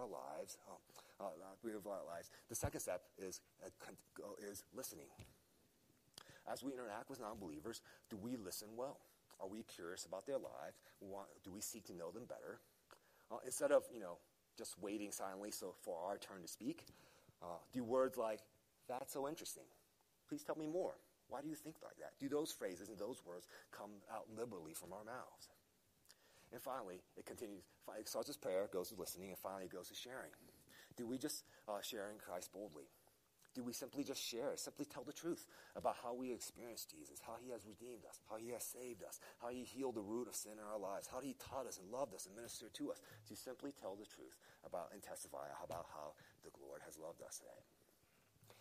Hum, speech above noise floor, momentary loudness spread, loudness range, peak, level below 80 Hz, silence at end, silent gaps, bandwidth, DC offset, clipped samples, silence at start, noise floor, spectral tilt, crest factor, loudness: none; 29 dB; 15 LU; 8 LU; -24 dBFS; -78 dBFS; 0 s; none; 15 kHz; under 0.1%; under 0.1%; 0 s; -78 dBFS; -3.5 dB/octave; 26 dB; -49 LUFS